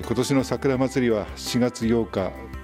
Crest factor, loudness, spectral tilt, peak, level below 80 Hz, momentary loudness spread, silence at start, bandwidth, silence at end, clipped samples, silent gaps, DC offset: 14 dB; -24 LUFS; -5.5 dB/octave; -8 dBFS; -44 dBFS; 5 LU; 0 s; 15.5 kHz; 0 s; under 0.1%; none; under 0.1%